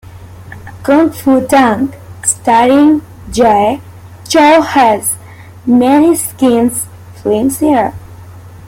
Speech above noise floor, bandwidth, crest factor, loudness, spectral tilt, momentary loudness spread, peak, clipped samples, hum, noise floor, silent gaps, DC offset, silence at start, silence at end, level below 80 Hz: 24 dB; 17 kHz; 12 dB; -10 LUFS; -4 dB/octave; 14 LU; 0 dBFS; under 0.1%; none; -33 dBFS; none; under 0.1%; 0.1 s; 0.1 s; -42 dBFS